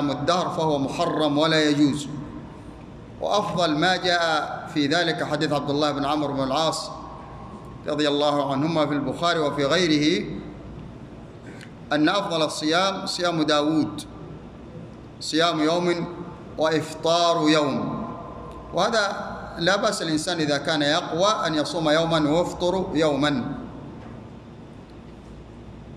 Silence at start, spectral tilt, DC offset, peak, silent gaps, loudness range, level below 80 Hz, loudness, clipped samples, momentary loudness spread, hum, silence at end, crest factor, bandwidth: 0 s; -4.5 dB/octave; under 0.1%; -6 dBFS; none; 3 LU; -50 dBFS; -23 LUFS; under 0.1%; 21 LU; none; 0 s; 18 dB; 12.5 kHz